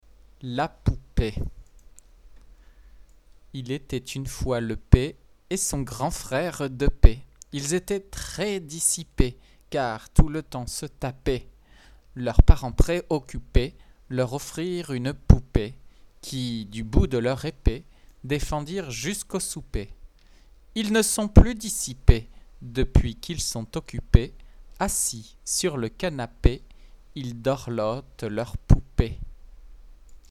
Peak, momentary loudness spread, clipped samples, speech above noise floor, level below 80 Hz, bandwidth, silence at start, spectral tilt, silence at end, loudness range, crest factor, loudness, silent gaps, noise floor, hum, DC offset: 0 dBFS; 14 LU; under 0.1%; 30 dB; -28 dBFS; 14.5 kHz; 0.45 s; -5 dB/octave; 0.15 s; 6 LU; 24 dB; -26 LUFS; none; -53 dBFS; none; under 0.1%